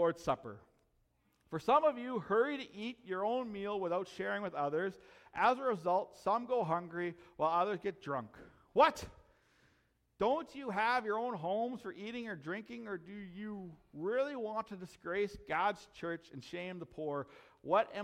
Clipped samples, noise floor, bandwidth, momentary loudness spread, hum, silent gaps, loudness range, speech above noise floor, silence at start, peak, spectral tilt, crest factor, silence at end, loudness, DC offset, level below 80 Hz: under 0.1%; -76 dBFS; 14.5 kHz; 14 LU; none; none; 6 LU; 39 dB; 0 s; -14 dBFS; -5.5 dB/octave; 22 dB; 0 s; -36 LUFS; under 0.1%; -70 dBFS